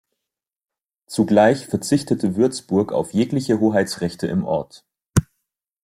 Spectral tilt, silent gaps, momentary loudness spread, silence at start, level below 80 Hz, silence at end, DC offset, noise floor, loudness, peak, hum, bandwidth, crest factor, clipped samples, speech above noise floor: -6 dB/octave; none; 9 LU; 1.1 s; -48 dBFS; 0.6 s; under 0.1%; -84 dBFS; -20 LUFS; 0 dBFS; none; 16 kHz; 20 dB; under 0.1%; 65 dB